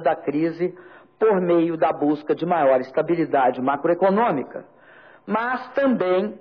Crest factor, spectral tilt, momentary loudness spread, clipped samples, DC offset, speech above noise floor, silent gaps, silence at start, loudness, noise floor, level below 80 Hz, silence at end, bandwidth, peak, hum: 14 dB; -9.5 dB/octave; 8 LU; under 0.1%; under 0.1%; 28 dB; none; 0 s; -21 LUFS; -49 dBFS; -68 dBFS; 0 s; 5.4 kHz; -8 dBFS; none